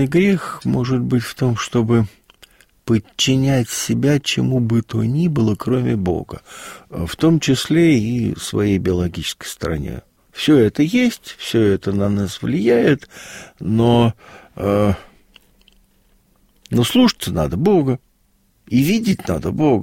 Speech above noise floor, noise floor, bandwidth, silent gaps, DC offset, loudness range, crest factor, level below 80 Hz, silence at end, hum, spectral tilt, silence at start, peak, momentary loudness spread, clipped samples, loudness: 42 dB; -59 dBFS; 16.5 kHz; none; under 0.1%; 3 LU; 16 dB; -42 dBFS; 0 s; none; -6 dB/octave; 0 s; -2 dBFS; 12 LU; under 0.1%; -18 LUFS